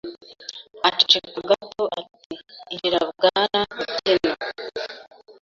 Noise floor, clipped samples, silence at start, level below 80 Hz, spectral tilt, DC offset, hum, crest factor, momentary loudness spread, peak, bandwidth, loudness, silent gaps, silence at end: -40 dBFS; under 0.1%; 0.05 s; -62 dBFS; -3 dB/octave; under 0.1%; none; 24 dB; 20 LU; 0 dBFS; 7.6 kHz; -21 LUFS; 2.26-2.30 s; 0.1 s